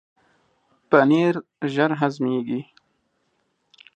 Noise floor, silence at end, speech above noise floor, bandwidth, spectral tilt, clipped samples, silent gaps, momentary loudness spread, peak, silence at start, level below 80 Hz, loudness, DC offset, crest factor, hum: -70 dBFS; 1.35 s; 50 dB; 8.6 kHz; -7.5 dB/octave; under 0.1%; none; 11 LU; -2 dBFS; 0.9 s; -76 dBFS; -21 LUFS; under 0.1%; 22 dB; none